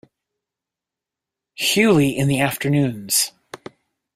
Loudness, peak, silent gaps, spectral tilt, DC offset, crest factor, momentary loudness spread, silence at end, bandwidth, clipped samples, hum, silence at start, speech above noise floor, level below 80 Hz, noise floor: -18 LUFS; -4 dBFS; none; -4 dB/octave; under 0.1%; 18 dB; 21 LU; 0.6 s; 16 kHz; under 0.1%; none; 1.6 s; 69 dB; -54 dBFS; -87 dBFS